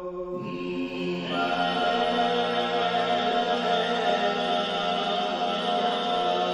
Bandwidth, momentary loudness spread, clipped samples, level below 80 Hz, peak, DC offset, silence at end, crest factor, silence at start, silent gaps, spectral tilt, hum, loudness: 11 kHz; 7 LU; under 0.1%; -60 dBFS; -12 dBFS; under 0.1%; 0 s; 14 dB; 0 s; none; -4.5 dB/octave; none; -26 LUFS